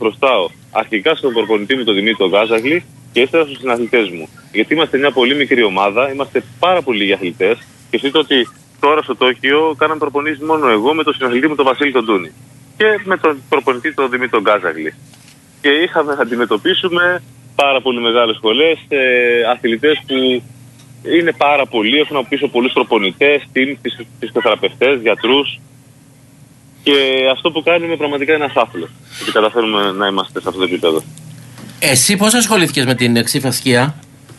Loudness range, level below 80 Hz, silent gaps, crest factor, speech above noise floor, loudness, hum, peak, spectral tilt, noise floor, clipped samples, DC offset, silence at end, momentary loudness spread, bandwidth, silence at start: 2 LU; -60 dBFS; none; 14 dB; 29 dB; -14 LUFS; none; 0 dBFS; -3.5 dB/octave; -44 dBFS; under 0.1%; under 0.1%; 0.05 s; 7 LU; 12.5 kHz; 0 s